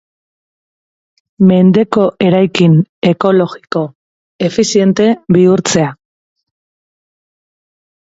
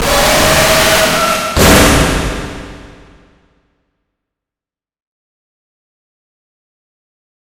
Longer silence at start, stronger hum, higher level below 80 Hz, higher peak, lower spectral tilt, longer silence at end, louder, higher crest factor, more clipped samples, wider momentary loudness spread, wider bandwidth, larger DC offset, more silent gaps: first, 1.4 s vs 0 s; neither; second, -52 dBFS vs -26 dBFS; about the same, 0 dBFS vs 0 dBFS; first, -6 dB/octave vs -3 dB/octave; second, 2.2 s vs 4.55 s; about the same, -11 LUFS vs -9 LUFS; about the same, 12 dB vs 14 dB; second, under 0.1% vs 0.3%; second, 10 LU vs 15 LU; second, 8 kHz vs over 20 kHz; neither; first, 2.89-3.02 s, 3.95-4.39 s vs none